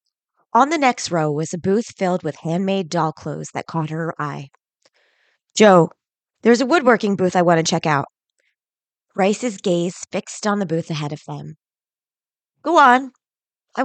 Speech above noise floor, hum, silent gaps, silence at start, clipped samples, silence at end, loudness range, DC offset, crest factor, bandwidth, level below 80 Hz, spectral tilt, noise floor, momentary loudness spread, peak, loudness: over 72 dB; none; none; 0.55 s; under 0.1%; 0 s; 8 LU; under 0.1%; 18 dB; 9.2 kHz; -68 dBFS; -5 dB/octave; under -90 dBFS; 16 LU; -2 dBFS; -19 LUFS